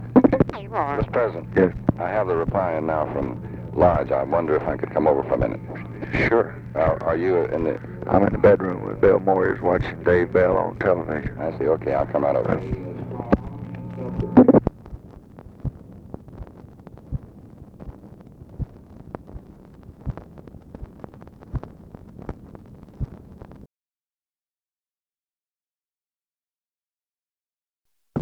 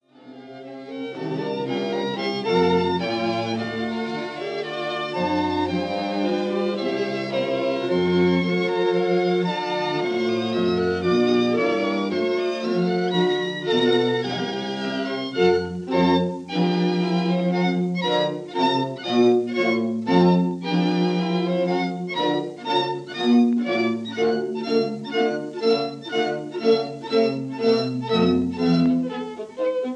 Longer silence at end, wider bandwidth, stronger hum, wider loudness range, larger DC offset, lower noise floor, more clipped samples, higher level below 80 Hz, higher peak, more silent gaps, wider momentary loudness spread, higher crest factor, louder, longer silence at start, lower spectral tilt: about the same, 0 s vs 0 s; second, 6.4 kHz vs 9.2 kHz; neither; first, 19 LU vs 3 LU; neither; first, under -90 dBFS vs -43 dBFS; neither; first, -42 dBFS vs -62 dBFS; first, 0 dBFS vs -6 dBFS; first, 23.81-23.85 s, 24.51-24.55 s vs none; first, 24 LU vs 7 LU; first, 24 dB vs 16 dB; about the same, -21 LUFS vs -22 LUFS; second, 0 s vs 0.25 s; first, -10 dB/octave vs -6.5 dB/octave